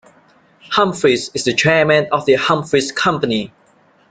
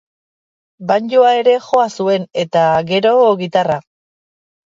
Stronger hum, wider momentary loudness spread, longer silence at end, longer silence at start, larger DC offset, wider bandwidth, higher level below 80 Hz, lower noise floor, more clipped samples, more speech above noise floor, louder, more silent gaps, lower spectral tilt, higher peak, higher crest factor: neither; about the same, 7 LU vs 7 LU; second, 0.65 s vs 0.9 s; about the same, 0.7 s vs 0.8 s; neither; first, 9.4 kHz vs 7.6 kHz; first, -54 dBFS vs -60 dBFS; second, -53 dBFS vs under -90 dBFS; neither; second, 38 dB vs over 77 dB; about the same, -15 LUFS vs -14 LUFS; neither; second, -4 dB/octave vs -5.5 dB/octave; about the same, -2 dBFS vs 0 dBFS; about the same, 16 dB vs 14 dB